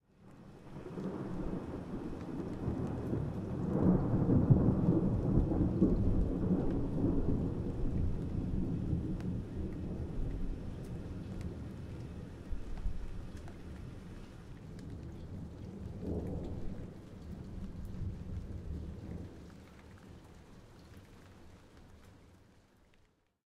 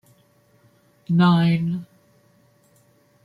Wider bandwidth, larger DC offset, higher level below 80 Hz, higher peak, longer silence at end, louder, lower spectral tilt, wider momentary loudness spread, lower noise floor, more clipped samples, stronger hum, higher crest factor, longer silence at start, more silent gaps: first, 10 kHz vs 5.2 kHz; neither; first, -44 dBFS vs -64 dBFS; second, -12 dBFS vs -6 dBFS; second, 1.1 s vs 1.4 s; second, -37 LUFS vs -20 LUFS; first, -10 dB/octave vs -8.5 dB/octave; first, 24 LU vs 12 LU; first, -70 dBFS vs -59 dBFS; neither; neither; first, 24 dB vs 18 dB; second, 0.2 s vs 1.1 s; neither